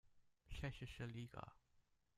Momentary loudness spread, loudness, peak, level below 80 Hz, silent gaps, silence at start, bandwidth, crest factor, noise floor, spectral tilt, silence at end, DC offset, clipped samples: 8 LU; -53 LUFS; -32 dBFS; -62 dBFS; none; 0.05 s; 14.5 kHz; 22 dB; -79 dBFS; -6 dB/octave; 0.4 s; under 0.1%; under 0.1%